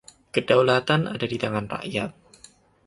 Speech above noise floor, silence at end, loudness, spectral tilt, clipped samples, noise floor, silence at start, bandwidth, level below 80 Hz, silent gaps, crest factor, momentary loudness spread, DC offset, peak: 31 dB; 0.75 s; -24 LUFS; -6 dB/octave; under 0.1%; -54 dBFS; 0.35 s; 11.5 kHz; -58 dBFS; none; 20 dB; 10 LU; under 0.1%; -4 dBFS